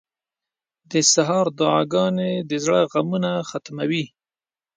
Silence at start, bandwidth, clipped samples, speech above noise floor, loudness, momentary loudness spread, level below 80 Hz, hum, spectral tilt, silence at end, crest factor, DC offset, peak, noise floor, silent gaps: 0.9 s; 9.8 kHz; under 0.1%; over 70 dB; -20 LUFS; 10 LU; -68 dBFS; none; -4 dB/octave; 0.7 s; 18 dB; under 0.1%; -4 dBFS; under -90 dBFS; none